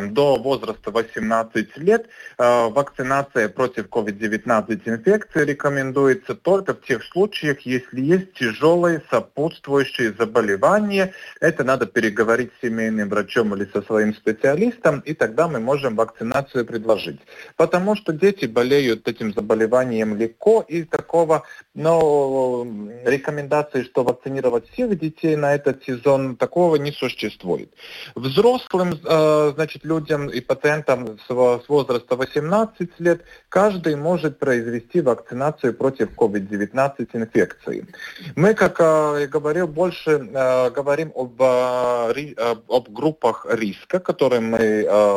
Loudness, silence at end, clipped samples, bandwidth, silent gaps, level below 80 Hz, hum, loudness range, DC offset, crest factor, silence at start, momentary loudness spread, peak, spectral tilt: -20 LUFS; 0 s; under 0.1%; 16 kHz; none; -56 dBFS; none; 2 LU; under 0.1%; 16 dB; 0 s; 7 LU; -4 dBFS; -6 dB/octave